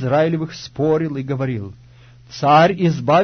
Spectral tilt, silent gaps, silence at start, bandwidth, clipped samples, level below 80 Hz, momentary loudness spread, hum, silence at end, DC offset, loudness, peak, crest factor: -7 dB/octave; none; 0 s; 6.6 kHz; under 0.1%; -52 dBFS; 16 LU; none; 0 s; under 0.1%; -18 LUFS; -2 dBFS; 16 dB